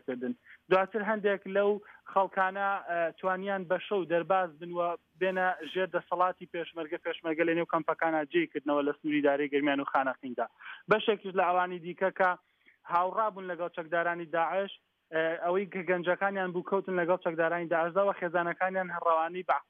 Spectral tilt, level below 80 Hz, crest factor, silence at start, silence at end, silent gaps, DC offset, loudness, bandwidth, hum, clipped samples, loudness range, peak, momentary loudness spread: -8 dB/octave; -80 dBFS; 18 dB; 0.1 s; 0.1 s; none; under 0.1%; -31 LUFS; 5.4 kHz; none; under 0.1%; 2 LU; -12 dBFS; 8 LU